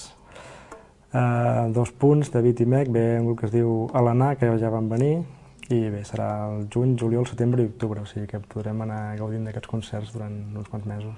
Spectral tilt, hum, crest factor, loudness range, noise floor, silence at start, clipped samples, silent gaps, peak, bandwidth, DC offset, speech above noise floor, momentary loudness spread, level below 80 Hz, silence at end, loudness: -8.5 dB/octave; none; 18 dB; 7 LU; -47 dBFS; 0 s; under 0.1%; none; -6 dBFS; 11 kHz; under 0.1%; 24 dB; 13 LU; -54 dBFS; 0 s; -24 LUFS